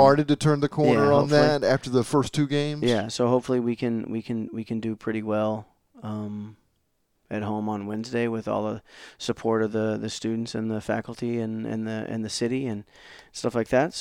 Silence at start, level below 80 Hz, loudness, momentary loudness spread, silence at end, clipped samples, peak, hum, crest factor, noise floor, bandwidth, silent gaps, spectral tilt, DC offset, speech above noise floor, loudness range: 0 s; -60 dBFS; -26 LUFS; 13 LU; 0 s; under 0.1%; -4 dBFS; none; 20 dB; -72 dBFS; 15 kHz; none; -6 dB/octave; under 0.1%; 47 dB; 9 LU